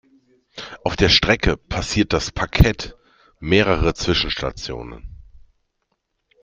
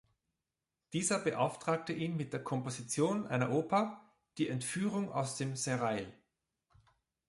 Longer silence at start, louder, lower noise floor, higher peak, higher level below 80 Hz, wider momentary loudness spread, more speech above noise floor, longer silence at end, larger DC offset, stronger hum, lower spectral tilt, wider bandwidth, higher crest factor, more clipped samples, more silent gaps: second, 0.55 s vs 0.9 s; first, -19 LUFS vs -35 LUFS; second, -73 dBFS vs -90 dBFS; first, 0 dBFS vs -16 dBFS; first, -30 dBFS vs -74 dBFS; first, 20 LU vs 7 LU; about the same, 54 dB vs 55 dB; about the same, 1.25 s vs 1.15 s; neither; neither; about the same, -4.5 dB/octave vs -5 dB/octave; first, 16 kHz vs 11.5 kHz; about the same, 20 dB vs 20 dB; neither; neither